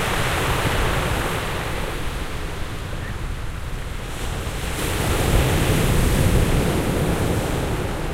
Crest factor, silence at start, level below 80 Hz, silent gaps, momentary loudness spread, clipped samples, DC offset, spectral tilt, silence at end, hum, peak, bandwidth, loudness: 18 dB; 0 s; -26 dBFS; none; 11 LU; under 0.1%; under 0.1%; -5 dB/octave; 0 s; none; -4 dBFS; 16 kHz; -23 LUFS